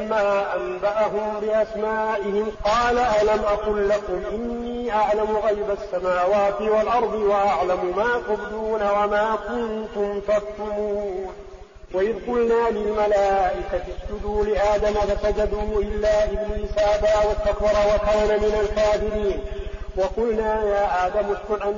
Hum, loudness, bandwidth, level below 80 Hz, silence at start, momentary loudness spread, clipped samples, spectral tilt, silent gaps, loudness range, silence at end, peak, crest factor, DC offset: none; -22 LUFS; 7.4 kHz; -36 dBFS; 0 s; 8 LU; under 0.1%; -4 dB/octave; none; 3 LU; 0 s; -10 dBFS; 10 dB; under 0.1%